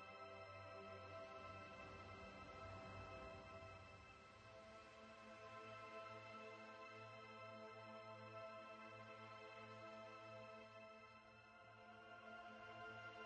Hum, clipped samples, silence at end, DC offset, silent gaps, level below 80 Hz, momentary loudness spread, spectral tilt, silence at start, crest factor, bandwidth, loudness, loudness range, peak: none; under 0.1%; 0 s; under 0.1%; none; -78 dBFS; 6 LU; -5 dB/octave; 0 s; 14 dB; 8.8 kHz; -58 LUFS; 3 LU; -44 dBFS